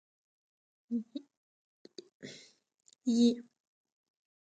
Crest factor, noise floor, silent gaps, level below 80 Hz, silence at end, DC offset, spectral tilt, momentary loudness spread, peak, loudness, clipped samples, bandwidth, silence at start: 22 dB; -59 dBFS; 1.37-1.85 s, 2.14-2.20 s; -84 dBFS; 1 s; under 0.1%; -5 dB/octave; 25 LU; -16 dBFS; -32 LUFS; under 0.1%; 8.8 kHz; 0.9 s